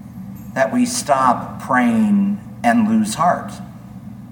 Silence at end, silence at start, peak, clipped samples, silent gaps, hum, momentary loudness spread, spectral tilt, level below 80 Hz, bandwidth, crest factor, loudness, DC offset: 0 s; 0 s; -2 dBFS; under 0.1%; none; none; 19 LU; -5 dB/octave; -50 dBFS; 18.5 kHz; 16 dB; -17 LUFS; under 0.1%